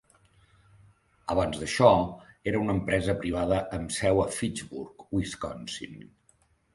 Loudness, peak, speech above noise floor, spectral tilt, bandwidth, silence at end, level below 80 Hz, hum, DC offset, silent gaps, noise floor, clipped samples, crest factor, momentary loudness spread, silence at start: -28 LUFS; -4 dBFS; 39 dB; -5.5 dB/octave; 11.5 kHz; 0.7 s; -48 dBFS; none; under 0.1%; none; -66 dBFS; under 0.1%; 24 dB; 17 LU; 1.25 s